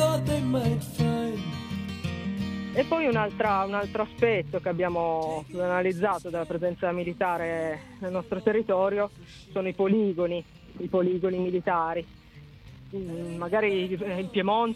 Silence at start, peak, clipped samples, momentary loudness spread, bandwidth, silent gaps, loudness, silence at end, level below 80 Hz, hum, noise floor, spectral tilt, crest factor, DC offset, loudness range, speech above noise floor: 0 s; -10 dBFS; under 0.1%; 10 LU; 16 kHz; none; -28 LUFS; 0 s; -54 dBFS; none; -49 dBFS; -6.5 dB/octave; 18 dB; under 0.1%; 2 LU; 22 dB